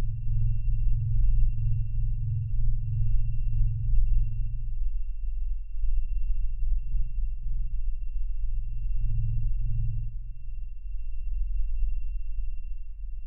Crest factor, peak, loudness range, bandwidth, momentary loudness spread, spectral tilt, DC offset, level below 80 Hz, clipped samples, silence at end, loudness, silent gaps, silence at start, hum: 14 dB; -10 dBFS; 5 LU; 2.9 kHz; 11 LU; -12 dB/octave; 3%; -26 dBFS; under 0.1%; 0 s; -33 LUFS; none; 0 s; none